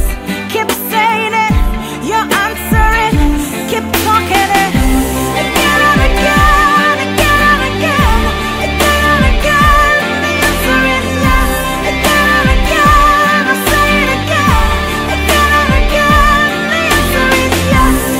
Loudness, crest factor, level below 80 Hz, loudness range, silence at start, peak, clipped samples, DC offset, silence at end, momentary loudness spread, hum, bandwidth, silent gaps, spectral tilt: -10 LUFS; 10 dB; -18 dBFS; 3 LU; 0 s; 0 dBFS; under 0.1%; under 0.1%; 0 s; 6 LU; none; 16.5 kHz; none; -4 dB/octave